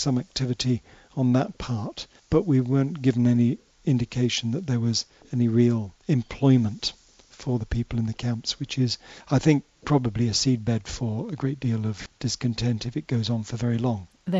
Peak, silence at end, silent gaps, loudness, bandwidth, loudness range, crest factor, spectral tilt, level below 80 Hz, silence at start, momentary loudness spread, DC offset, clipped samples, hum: -6 dBFS; 0 s; none; -25 LUFS; 8 kHz; 3 LU; 18 dB; -6 dB/octave; -48 dBFS; 0 s; 9 LU; under 0.1%; under 0.1%; none